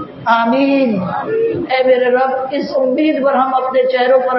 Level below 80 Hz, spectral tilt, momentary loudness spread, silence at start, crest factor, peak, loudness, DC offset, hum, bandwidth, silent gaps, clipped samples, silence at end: -60 dBFS; -8 dB/octave; 5 LU; 0 s; 14 dB; 0 dBFS; -14 LUFS; under 0.1%; none; 6 kHz; none; under 0.1%; 0 s